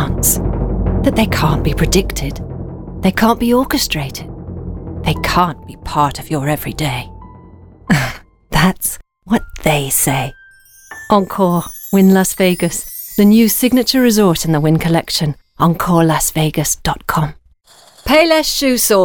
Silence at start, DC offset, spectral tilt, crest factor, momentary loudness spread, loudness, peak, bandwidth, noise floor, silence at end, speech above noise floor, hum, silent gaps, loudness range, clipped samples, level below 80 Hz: 0 s; under 0.1%; -4.5 dB/octave; 14 dB; 15 LU; -14 LUFS; 0 dBFS; over 20 kHz; -47 dBFS; 0 s; 33 dB; none; none; 6 LU; under 0.1%; -28 dBFS